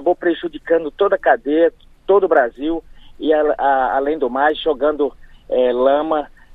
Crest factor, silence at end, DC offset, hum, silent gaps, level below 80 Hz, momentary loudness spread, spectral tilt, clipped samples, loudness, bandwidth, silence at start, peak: 16 dB; 0.3 s; under 0.1%; none; none; -44 dBFS; 8 LU; -6.5 dB/octave; under 0.1%; -17 LUFS; 4.1 kHz; 0 s; 0 dBFS